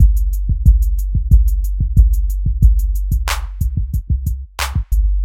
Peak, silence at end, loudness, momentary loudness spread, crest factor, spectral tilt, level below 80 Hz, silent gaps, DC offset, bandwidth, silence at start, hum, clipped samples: 0 dBFS; 0 s; -18 LUFS; 7 LU; 14 dB; -5.5 dB/octave; -14 dBFS; none; under 0.1%; 15.5 kHz; 0 s; none; under 0.1%